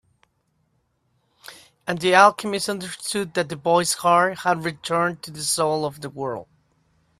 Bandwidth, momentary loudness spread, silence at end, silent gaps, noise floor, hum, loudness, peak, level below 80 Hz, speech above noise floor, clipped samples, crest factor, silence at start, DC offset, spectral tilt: 15.5 kHz; 15 LU; 0.75 s; none; -69 dBFS; none; -21 LUFS; 0 dBFS; -64 dBFS; 47 dB; under 0.1%; 22 dB; 1.5 s; under 0.1%; -3.5 dB/octave